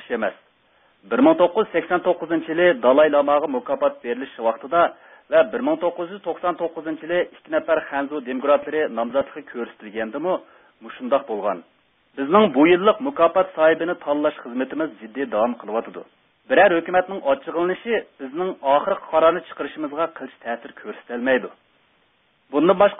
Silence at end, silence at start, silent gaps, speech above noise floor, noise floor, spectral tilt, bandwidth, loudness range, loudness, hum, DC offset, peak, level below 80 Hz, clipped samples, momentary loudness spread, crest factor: 0 s; 0 s; none; 42 dB; -63 dBFS; -10 dB/octave; 3.9 kHz; 5 LU; -21 LUFS; none; under 0.1%; -2 dBFS; -62 dBFS; under 0.1%; 15 LU; 18 dB